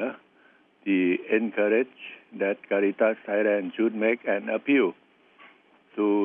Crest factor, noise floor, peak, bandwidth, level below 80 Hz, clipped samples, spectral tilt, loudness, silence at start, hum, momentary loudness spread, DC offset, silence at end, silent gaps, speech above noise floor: 16 dB; -60 dBFS; -10 dBFS; 3.7 kHz; -86 dBFS; under 0.1%; -9 dB/octave; -25 LUFS; 0 s; none; 11 LU; under 0.1%; 0 s; none; 35 dB